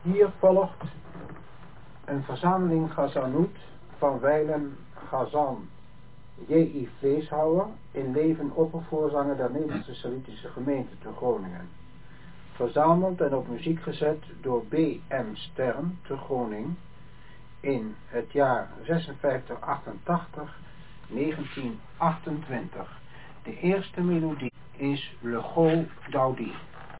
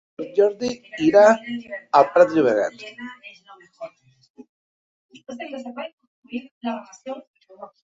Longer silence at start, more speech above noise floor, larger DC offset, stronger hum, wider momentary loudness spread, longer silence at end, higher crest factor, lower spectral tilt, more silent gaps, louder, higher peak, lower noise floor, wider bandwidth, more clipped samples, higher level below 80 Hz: second, 0.05 s vs 0.2 s; first, 24 dB vs 20 dB; first, 0.6% vs under 0.1%; neither; second, 17 LU vs 23 LU; second, 0 s vs 0.2 s; about the same, 20 dB vs 20 dB; first, -11 dB/octave vs -5 dB/octave; second, none vs 4.30-4.34 s, 4.49-5.09 s, 5.93-5.98 s, 6.07-6.23 s, 6.51-6.61 s, 7.27-7.34 s; second, -28 LUFS vs -19 LUFS; second, -8 dBFS vs -2 dBFS; first, -51 dBFS vs -40 dBFS; second, 4 kHz vs 7.8 kHz; neither; first, -56 dBFS vs -68 dBFS